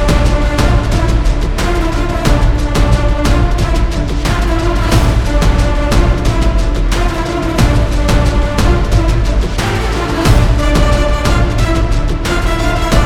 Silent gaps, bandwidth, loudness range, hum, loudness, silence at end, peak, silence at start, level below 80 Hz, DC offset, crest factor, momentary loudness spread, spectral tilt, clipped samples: none; 14.5 kHz; 1 LU; none; -14 LUFS; 0 s; 0 dBFS; 0 s; -12 dBFS; under 0.1%; 10 dB; 4 LU; -6 dB/octave; under 0.1%